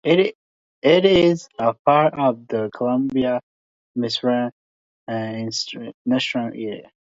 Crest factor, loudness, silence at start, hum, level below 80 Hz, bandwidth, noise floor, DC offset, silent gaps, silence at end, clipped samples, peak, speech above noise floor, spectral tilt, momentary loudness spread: 18 dB; -21 LUFS; 0.05 s; none; -56 dBFS; 7.8 kHz; under -90 dBFS; under 0.1%; 0.35-0.82 s, 1.79-1.85 s, 3.43-3.95 s, 4.52-5.07 s, 5.94-6.05 s; 0.25 s; under 0.1%; -2 dBFS; over 70 dB; -5.5 dB/octave; 13 LU